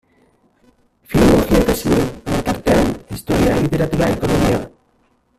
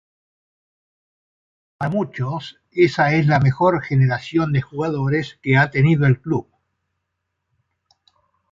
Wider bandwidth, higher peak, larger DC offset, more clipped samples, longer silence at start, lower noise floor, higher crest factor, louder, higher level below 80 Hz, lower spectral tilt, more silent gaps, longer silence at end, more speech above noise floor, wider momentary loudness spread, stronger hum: first, 16 kHz vs 7.4 kHz; about the same, 0 dBFS vs -2 dBFS; neither; neither; second, 1.1 s vs 1.8 s; second, -59 dBFS vs -77 dBFS; about the same, 16 dB vs 18 dB; first, -16 LUFS vs -19 LUFS; first, -30 dBFS vs -50 dBFS; second, -6 dB/octave vs -8 dB/octave; neither; second, 0.7 s vs 2.1 s; second, 43 dB vs 59 dB; about the same, 8 LU vs 10 LU; neither